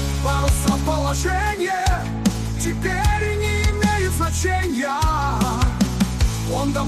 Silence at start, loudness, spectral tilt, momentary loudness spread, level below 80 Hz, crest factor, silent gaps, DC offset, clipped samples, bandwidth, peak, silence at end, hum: 0 s; -21 LUFS; -5 dB/octave; 3 LU; -24 dBFS; 12 dB; none; under 0.1%; under 0.1%; 14 kHz; -8 dBFS; 0 s; none